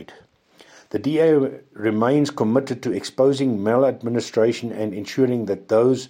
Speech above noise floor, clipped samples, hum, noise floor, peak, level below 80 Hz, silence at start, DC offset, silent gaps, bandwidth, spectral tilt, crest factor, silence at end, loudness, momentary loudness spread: 32 dB; under 0.1%; none; -52 dBFS; -4 dBFS; -68 dBFS; 0 s; under 0.1%; none; 16 kHz; -6.5 dB/octave; 16 dB; 0.05 s; -21 LUFS; 8 LU